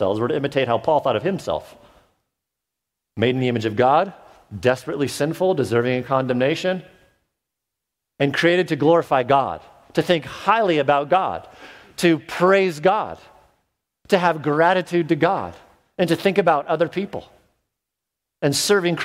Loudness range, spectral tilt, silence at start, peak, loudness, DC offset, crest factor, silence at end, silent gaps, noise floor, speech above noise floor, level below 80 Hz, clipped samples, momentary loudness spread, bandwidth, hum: 4 LU; -5 dB/octave; 0 s; -2 dBFS; -20 LUFS; under 0.1%; 20 dB; 0 s; none; -83 dBFS; 64 dB; -58 dBFS; under 0.1%; 11 LU; 16 kHz; none